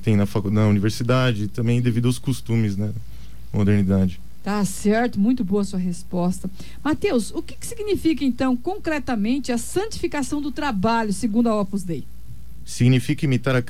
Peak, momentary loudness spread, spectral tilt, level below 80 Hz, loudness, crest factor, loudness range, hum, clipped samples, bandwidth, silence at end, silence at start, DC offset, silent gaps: -8 dBFS; 11 LU; -6.5 dB/octave; -44 dBFS; -22 LUFS; 14 dB; 2 LU; none; under 0.1%; 16 kHz; 0.05 s; 0 s; 3%; none